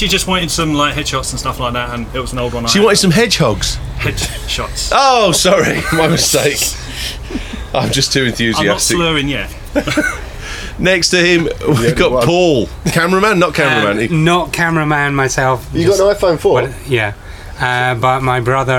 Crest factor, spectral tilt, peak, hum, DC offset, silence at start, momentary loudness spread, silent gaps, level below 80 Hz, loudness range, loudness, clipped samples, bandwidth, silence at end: 14 dB; -4 dB/octave; 0 dBFS; none; under 0.1%; 0 s; 10 LU; none; -30 dBFS; 2 LU; -13 LUFS; under 0.1%; 19 kHz; 0 s